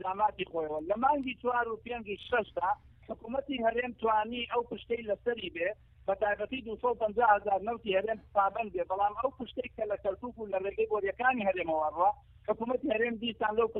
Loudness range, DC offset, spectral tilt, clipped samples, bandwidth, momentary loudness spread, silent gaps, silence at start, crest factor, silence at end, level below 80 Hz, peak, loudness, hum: 2 LU; under 0.1%; -7.5 dB/octave; under 0.1%; 4.1 kHz; 9 LU; none; 0 s; 20 dB; 0 s; -60 dBFS; -12 dBFS; -32 LUFS; none